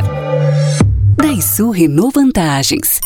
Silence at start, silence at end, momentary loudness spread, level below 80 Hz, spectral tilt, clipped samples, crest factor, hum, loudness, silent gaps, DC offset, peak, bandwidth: 0 s; 0 s; 2 LU; -26 dBFS; -5 dB/octave; under 0.1%; 12 dB; none; -12 LUFS; none; under 0.1%; 0 dBFS; 20 kHz